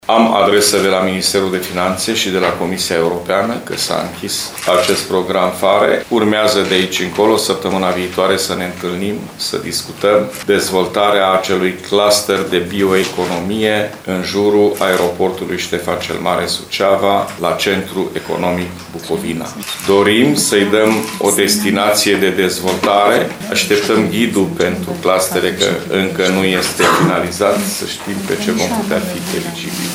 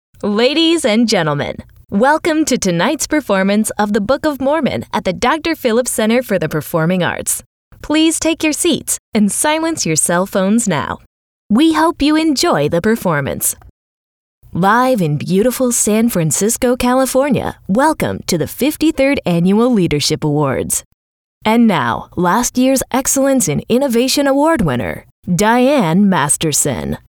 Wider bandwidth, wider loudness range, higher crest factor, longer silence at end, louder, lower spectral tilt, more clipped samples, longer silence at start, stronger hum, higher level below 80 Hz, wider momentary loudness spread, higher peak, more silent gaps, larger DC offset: about the same, over 20 kHz vs 20 kHz; about the same, 3 LU vs 2 LU; about the same, 14 dB vs 14 dB; second, 0 s vs 0.15 s; about the same, -14 LUFS vs -14 LUFS; about the same, -3.5 dB/octave vs -4 dB/octave; neither; second, 0.05 s vs 0.25 s; neither; second, -50 dBFS vs -42 dBFS; about the same, 8 LU vs 6 LU; about the same, 0 dBFS vs -2 dBFS; second, none vs 7.46-7.71 s, 8.99-9.12 s, 11.06-11.50 s, 13.70-14.42 s, 20.85-21.41 s, 25.11-25.23 s; neither